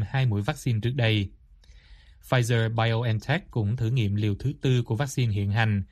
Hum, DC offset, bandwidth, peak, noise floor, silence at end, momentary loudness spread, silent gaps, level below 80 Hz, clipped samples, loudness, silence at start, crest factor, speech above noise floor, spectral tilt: none; under 0.1%; 13 kHz; -8 dBFS; -52 dBFS; 0.05 s; 4 LU; none; -50 dBFS; under 0.1%; -26 LUFS; 0 s; 18 dB; 28 dB; -6.5 dB/octave